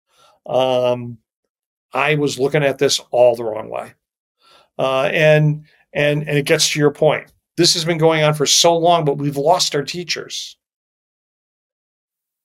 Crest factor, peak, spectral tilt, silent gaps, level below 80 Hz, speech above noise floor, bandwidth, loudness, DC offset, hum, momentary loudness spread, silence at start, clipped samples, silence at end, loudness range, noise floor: 16 dB; -2 dBFS; -4 dB/octave; 1.36-1.43 s, 1.49-1.89 s, 4.18-4.35 s; -60 dBFS; over 74 dB; 16.5 kHz; -16 LUFS; under 0.1%; none; 14 LU; 0.45 s; under 0.1%; 1.95 s; 4 LU; under -90 dBFS